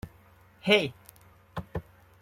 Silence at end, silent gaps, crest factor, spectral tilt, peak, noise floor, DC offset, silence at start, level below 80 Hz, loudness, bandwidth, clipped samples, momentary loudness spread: 0.4 s; none; 24 dB; -5 dB/octave; -8 dBFS; -58 dBFS; under 0.1%; 0.05 s; -56 dBFS; -27 LUFS; 16 kHz; under 0.1%; 19 LU